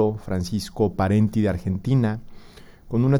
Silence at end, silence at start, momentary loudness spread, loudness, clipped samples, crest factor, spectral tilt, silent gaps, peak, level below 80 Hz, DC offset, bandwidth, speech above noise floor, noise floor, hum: 0 s; 0 s; 8 LU; -23 LUFS; under 0.1%; 14 dB; -8 dB/octave; none; -8 dBFS; -44 dBFS; under 0.1%; 13 kHz; 24 dB; -45 dBFS; none